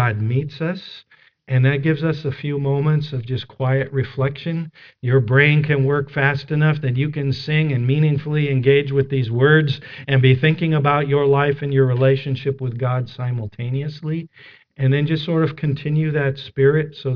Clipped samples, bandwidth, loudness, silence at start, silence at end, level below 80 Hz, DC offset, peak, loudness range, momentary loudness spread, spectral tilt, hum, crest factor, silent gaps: under 0.1%; 5.4 kHz; -19 LUFS; 0 s; 0 s; -54 dBFS; under 0.1%; 0 dBFS; 5 LU; 11 LU; -9.5 dB/octave; none; 18 dB; none